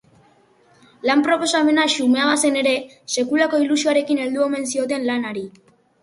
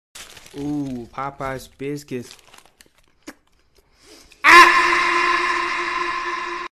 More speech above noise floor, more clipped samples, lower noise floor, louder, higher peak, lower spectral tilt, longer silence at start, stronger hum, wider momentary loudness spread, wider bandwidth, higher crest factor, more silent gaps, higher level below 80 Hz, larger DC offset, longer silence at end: first, 37 dB vs 30 dB; neither; about the same, -55 dBFS vs -58 dBFS; second, -19 LUFS vs -16 LUFS; second, -4 dBFS vs 0 dBFS; about the same, -2 dB/octave vs -2.5 dB/octave; first, 1.05 s vs 0.15 s; neither; second, 8 LU vs 22 LU; second, 11.5 kHz vs 13.5 kHz; about the same, 16 dB vs 20 dB; neither; second, -68 dBFS vs -50 dBFS; neither; first, 0.55 s vs 0.05 s